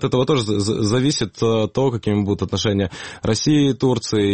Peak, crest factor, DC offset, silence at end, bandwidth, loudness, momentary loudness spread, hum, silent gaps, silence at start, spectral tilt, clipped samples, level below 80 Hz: -6 dBFS; 14 dB; 0.3%; 0 s; 8.8 kHz; -19 LUFS; 5 LU; none; none; 0 s; -5.5 dB/octave; under 0.1%; -46 dBFS